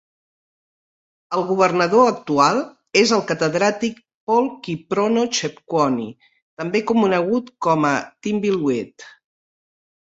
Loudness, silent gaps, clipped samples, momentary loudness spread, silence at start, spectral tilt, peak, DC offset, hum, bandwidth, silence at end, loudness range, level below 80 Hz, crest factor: -19 LUFS; 4.14-4.27 s, 6.42-6.57 s; under 0.1%; 10 LU; 1.3 s; -4.5 dB/octave; -2 dBFS; under 0.1%; none; 8 kHz; 1 s; 3 LU; -62 dBFS; 18 dB